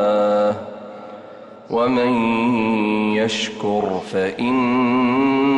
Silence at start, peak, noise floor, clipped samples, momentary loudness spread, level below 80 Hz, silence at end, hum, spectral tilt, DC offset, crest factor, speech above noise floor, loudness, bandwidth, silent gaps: 0 s; -8 dBFS; -39 dBFS; under 0.1%; 18 LU; -58 dBFS; 0 s; none; -5.5 dB/octave; under 0.1%; 10 dB; 21 dB; -19 LUFS; 9.4 kHz; none